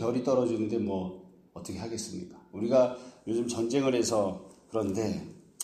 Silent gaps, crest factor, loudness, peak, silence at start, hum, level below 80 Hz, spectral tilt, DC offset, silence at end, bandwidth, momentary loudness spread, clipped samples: none; 18 dB; -30 LUFS; -12 dBFS; 0 s; none; -64 dBFS; -5.5 dB/octave; under 0.1%; 0 s; 13.5 kHz; 17 LU; under 0.1%